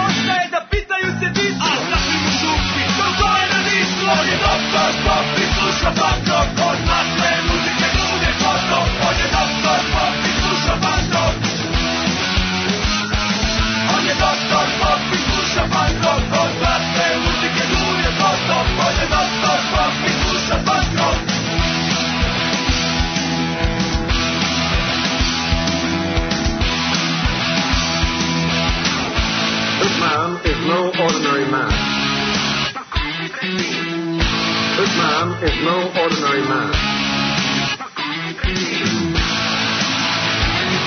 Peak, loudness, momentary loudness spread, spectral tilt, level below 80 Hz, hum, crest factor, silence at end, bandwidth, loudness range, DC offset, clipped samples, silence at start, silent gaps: -4 dBFS; -17 LUFS; 3 LU; -3.5 dB/octave; -28 dBFS; none; 14 dB; 0 s; 6.6 kHz; 2 LU; under 0.1%; under 0.1%; 0 s; none